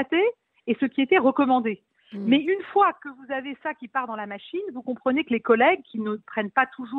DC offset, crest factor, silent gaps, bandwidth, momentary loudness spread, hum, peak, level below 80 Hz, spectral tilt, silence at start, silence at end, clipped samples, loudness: under 0.1%; 18 dB; none; 4.1 kHz; 13 LU; none; -6 dBFS; -72 dBFS; -8 dB/octave; 0 s; 0 s; under 0.1%; -24 LUFS